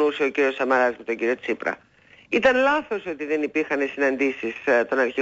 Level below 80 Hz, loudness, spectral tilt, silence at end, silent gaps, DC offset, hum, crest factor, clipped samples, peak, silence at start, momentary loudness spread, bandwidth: -60 dBFS; -23 LUFS; -4.5 dB/octave; 0 s; none; under 0.1%; none; 16 dB; under 0.1%; -8 dBFS; 0 s; 8 LU; 7.8 kHz